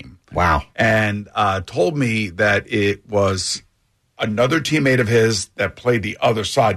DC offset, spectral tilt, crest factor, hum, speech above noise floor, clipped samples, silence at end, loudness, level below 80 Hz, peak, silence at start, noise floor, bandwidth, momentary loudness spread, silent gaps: under 0.1%; -5 dB/octave; 12 dB; none; 46 dB; under 0.1%; 0 s; -19 LUFS; -40 dBFS; -6 dBFS; 0.05 s; -64 dBFS; 13.5 kHz; 6 LU; none